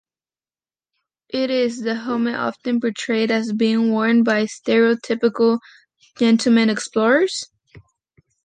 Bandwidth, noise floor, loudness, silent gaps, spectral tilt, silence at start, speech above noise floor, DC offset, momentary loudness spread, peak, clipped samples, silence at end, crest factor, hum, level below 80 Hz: 9.4 kHz; under -90 dBFS; -19 LUFS; none; -4.5 dB/octave; 1.35 s; over 72 dB; under 0.1%; 8 LU; -4 dBFS; under 0.1%; 0.65 s; 16 dB; none; -68 dBFS